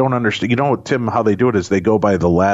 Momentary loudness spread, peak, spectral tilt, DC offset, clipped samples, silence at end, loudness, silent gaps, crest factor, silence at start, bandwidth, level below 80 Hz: 3 LU; -4 dBFS; -7 dB/octave; under 0.1%; under 0.1%; 0 s; -16 LUFS; none; 12 dB; 0 s; 8 kHz; -42 dBFS